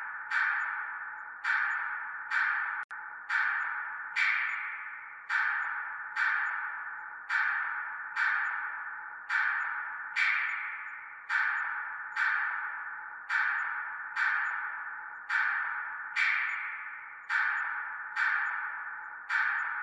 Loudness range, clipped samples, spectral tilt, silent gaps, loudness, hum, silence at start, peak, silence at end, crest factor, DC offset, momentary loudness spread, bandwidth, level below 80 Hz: 1 LU; under 0.1%; 1.5 dB/octave; 2.84-2.89 s; -31 LUFS; none; 0 s; -16 dBFS; 0 s; 18 dB; under 0.1%; 11 LU; 11 kHz; -84 dBFS